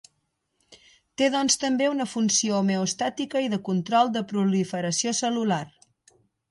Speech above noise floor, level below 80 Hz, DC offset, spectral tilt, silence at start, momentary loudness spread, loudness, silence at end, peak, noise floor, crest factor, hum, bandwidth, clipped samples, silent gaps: 51 dB; -70 dBFS; under 0.1%; -4 dB/octave; 0.7 s; 6 LU; -24 LUFS; 0.85 s; -8 dBFS; -75 dBFS; 18 dB; none; 11.5 kHz; under 0.1%; none